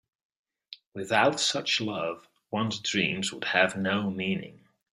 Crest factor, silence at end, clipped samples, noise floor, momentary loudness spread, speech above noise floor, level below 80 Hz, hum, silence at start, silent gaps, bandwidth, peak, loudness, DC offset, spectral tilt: 24 dB; 0.4 s; under 0.1%; -52 dBFS; 19 LU; 24 dB; -70 dBFS; none; 0.7 s; 0.86-0.92 s; 12.5 kHz; -6 dBFS; -27 LUFS; under 0.1%; -3.5 dB/octave